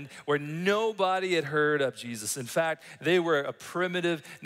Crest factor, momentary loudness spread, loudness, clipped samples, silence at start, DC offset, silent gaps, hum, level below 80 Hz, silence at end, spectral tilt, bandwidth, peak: 18 dB; 7 LU; -28 LUFS; under 0.1%; 0 s; under 0.1%; none; none; -78 dBFS; 0 s; -4 dB/octave; 16 kHz; -12 dBFS